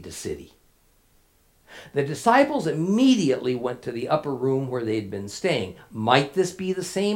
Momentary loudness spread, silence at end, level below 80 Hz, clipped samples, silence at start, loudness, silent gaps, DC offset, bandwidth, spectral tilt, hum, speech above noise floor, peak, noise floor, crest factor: 13 LU; 0 s; -62 dBFS; under 0.1%; 0 s; -24 LUFS; none; under 0.1%; 16.5 kHz; -5.5 dB/octave; none; 37 dB; -2 dBFS; -61 dBFS; 22 dB